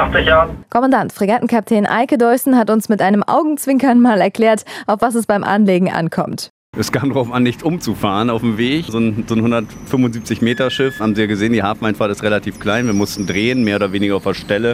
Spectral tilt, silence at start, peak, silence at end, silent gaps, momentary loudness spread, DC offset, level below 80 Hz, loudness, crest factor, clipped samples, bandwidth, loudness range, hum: -5.5 dB/octave; 0 s; 0 dBFS; 0 s; 6.50-6.73 s; 6 LU; under 0.1%; -40 dBFS; -15 LUFS; 14 dB; under 0.1%; 16 kHz; 4 LU; none